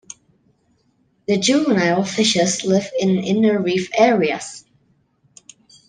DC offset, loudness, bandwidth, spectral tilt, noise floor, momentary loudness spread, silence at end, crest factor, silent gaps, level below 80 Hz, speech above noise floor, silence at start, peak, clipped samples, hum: under 0.1%; -18 LUFS; 10 kHz; -4.5 dB/octave; -62 dBFS; 13 LU; 1.3 s; 18 dB; none; -62 dBFS; 45 dB; 1.3 s; -2 dBFS; under 0.1%; none